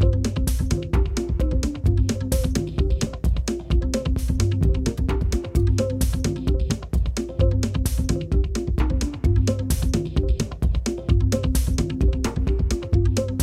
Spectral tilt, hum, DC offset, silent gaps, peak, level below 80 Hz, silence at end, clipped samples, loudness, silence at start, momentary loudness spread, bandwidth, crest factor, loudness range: -6.5 dB/octave; none; under 0.1%; none; -8 dBFS; -24 dBFS; 0 s; under 0.1%; -23 LUFS; 0 s; 4 LU; 15.5 kHz; 14 dB; 1 LU